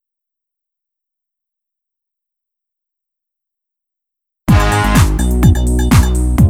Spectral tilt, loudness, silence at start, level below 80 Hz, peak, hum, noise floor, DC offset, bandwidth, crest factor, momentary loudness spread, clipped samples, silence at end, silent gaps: -6 dB/octave; -12 LUFS; 4.5 s; -20 dBFS; 0 dBFS; none; -81 dBFS; under 0.1%; 17 kHz; 14 dB; 3 LU; under 0.1%; 0 s; none